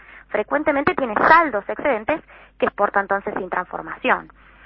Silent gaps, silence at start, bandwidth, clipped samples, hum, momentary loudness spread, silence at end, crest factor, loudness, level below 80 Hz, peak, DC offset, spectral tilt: none; 0.1 s; 6 kHz; under 0.1%; none; 12 LU; 0.4 s; 22 dB; -20 LUFS; -52 dBFS; 0 dBFS; under 0.1%; -8 dB/octave